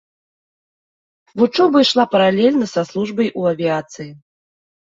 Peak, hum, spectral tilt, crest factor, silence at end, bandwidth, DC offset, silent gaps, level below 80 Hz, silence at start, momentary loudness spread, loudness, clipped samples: -2 dBFS; none; -5.5 dB/octave; 16 dB; 0.8 s; 7.8 kHz; under 0.1%; none; -64 dBFS; 1.35 s; 19 LU; -16 LUFS; under 0.1%